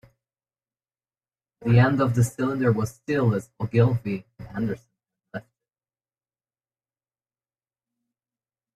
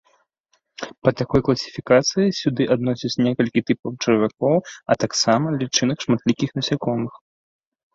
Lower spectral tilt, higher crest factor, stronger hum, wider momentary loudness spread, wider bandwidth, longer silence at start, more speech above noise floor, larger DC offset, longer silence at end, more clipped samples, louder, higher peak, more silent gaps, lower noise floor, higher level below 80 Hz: first, -7.5 dB/octave vs -5 dB/octave; about the same, 20 dB vs 20 dB; neither; first, 18 LU vs 6 LU; first, 13 kHz vs 7.8 kHz; first, 1.6 s vs 0.8 s; first, over 68 dB vs 48 dB; neither; first, 3.35 s vs 0.8 s; neither; second, -24 LUFS vs -21 LUFS; second, -6 dBFS vs -2 dBFS; second, none vs 3.79-3.83 s; first, under -90 dBFS vs -68 dBFS; about the same, -56 dBFS vs -52 dBFS